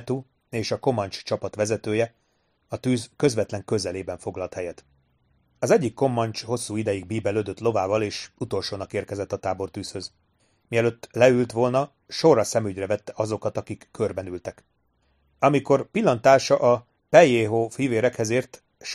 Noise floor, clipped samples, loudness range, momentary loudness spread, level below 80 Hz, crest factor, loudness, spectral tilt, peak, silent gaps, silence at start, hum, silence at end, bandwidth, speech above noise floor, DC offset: -69 dBFS; under 0.1%; 8 LU; 14 LU; -60 dBFS; 22 dB; -24 LUFS; -5.5 dB/octave; -2 dBFS; none; 0 s; none; 0 s; 13.5 kHz; 46 dB; under 0.1%